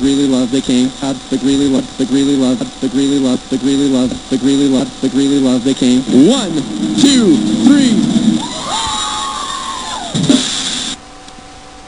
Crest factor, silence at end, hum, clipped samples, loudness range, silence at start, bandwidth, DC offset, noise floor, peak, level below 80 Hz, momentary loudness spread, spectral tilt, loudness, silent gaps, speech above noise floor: 12 dB; 0 s; none; 0.2%; 4 LU; 0 s; 10.5 kHz; 0.6%; -34 dBFS; 0 dBFS; -42 dBFS; 9 LU; -4.5 dB/octave; -13 LUFS; none; 22 dB